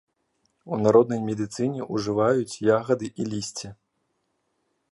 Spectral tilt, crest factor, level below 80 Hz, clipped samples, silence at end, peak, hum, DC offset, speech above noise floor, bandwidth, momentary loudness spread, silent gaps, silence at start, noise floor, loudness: -6 dB/octave; 20 dB; -62 dBFS; under 0.1%; 1.2 s; -4 dBFS; none; under 0.1%; 51 dB; 11.5 kHz; 13 LU; none; 0.65 s; -74 dBFS; -24 LUFS